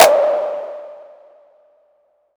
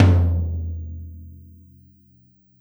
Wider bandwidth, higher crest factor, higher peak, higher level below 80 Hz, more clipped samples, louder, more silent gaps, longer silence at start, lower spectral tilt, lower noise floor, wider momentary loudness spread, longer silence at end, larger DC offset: about the same, over 20 kHz vs over 20 kHz; about the same, 18 dB vs 20 dB; about the same, 0 dBFS vs -2 dBFS; second, -66 dBFS vs -34 dBFS; neither; first, -17 LUFS vs -23 LUFS; neither; about the same, 0 s vs 0 s; second, -0.5 dB/octave vs -9 dB/octave; first, -60 dBFS vs -56 dBFS; about the same, 25 LU vs 25 LU; first, 1.35 s vs 1.2 s; neither